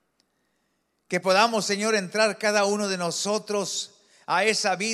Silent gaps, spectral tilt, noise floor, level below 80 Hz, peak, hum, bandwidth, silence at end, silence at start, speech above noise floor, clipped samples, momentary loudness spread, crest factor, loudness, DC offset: none; -2.5 dB/octave; -73 dBFS; -82 dBFS; -6 dBFS; none; 15 kHz; 0 s; 1.1 s; 49 dB; under 0.1%; 9 LU; 18 dB; -24 LUFS; under 0.1%